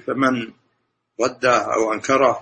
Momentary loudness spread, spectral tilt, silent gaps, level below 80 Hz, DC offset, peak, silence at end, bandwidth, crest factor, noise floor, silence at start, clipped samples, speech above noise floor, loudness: 8 LU; -4 dB/octave; none; -60 dBFS; under 0.1%; -2 dBFS; 0 s; 8.8 kHz; 18 dB; -71 dBFS; 0.05 s; under 0.1%; 52 dB; -19 LUFS